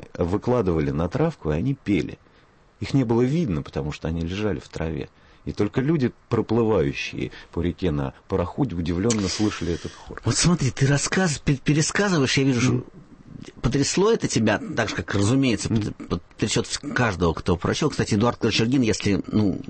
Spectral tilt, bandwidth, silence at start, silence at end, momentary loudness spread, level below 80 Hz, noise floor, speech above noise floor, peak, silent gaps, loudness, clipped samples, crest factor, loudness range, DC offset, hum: -5 dB/octave; 8.8 kHz; 0 s; 0 s; 9 LU; -42 dBFS; -55 dBFS; 32 dB; -8 dBFS; none; -23 LUFS; under 0.1%; 14 dB; 4 LU; under 0.1%; none